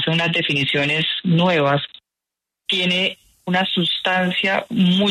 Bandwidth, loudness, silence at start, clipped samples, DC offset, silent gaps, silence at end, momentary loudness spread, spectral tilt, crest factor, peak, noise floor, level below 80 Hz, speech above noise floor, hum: 11.5 kHz; -18 LUFS; 0 s; under 0.1%; under 0.1%; none; 0 s; 6 LU; -5.5 dB/octave; 14 dB; -6 dBFS; -85 dBFS; -60 dBFS; 67 dB; none